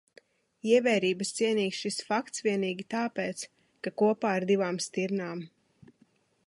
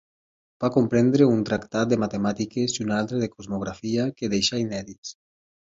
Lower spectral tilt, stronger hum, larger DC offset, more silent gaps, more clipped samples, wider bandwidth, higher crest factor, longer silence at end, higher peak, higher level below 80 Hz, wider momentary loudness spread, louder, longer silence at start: about the same, -4.5 dB/octave vs -5.5 dB/octave; neither; neither; second, none vs 4.98-5.03 s; neither; first, 11.5 kHz vs 8 kHz; about the same, 18 dB vs 20 dB; first, 1 s vs 0.55 s; second, -12 dBFS vs -6 dBFS; second, -78 dBFS vs -56 dBFS; about the same, 13 LU vs 11 LU; second, -29 LUFS vs -24 LUFS; about the same, 0.65 s vs 0.6 s